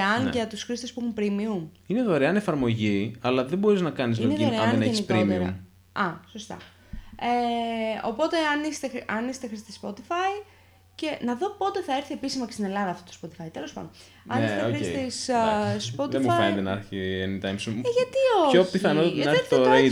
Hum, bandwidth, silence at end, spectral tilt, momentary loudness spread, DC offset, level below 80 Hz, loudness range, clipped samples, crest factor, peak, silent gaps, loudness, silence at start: none; 15.5 kHz; 0 s; -5.5 dB/octave; 15 LU; under 0.1%; -58 dBFS; 7 LU; under 0.1%; 20 dB; -6 dBFS; none; -25 LUFS; 0 s